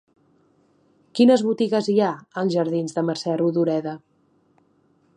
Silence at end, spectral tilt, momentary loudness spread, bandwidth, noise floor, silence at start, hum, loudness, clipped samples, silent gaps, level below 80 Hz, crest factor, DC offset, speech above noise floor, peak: 1.2 s; -6.5 dB/octave; 10 LU; 10.5 kHz; -63 dBFS; 1.15 s; none; -21 LUFS; under 0.1%; none; -74 dBFS; 18 dB; under 0.1%; 42 dB; -4 dBFS